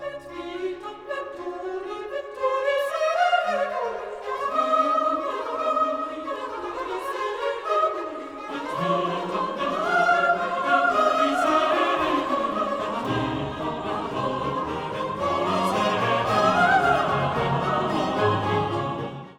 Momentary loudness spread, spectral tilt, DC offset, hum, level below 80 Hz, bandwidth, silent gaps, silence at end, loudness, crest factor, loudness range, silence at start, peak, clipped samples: 12 LU; -5.5 dB/octave; under 0.1%; none; -54 dBFS; 16.5 kHz; none; 0.05 s; -24 LUFS; 18 dB; 5 LU; 0 s; -8 dBFS; under 0.1%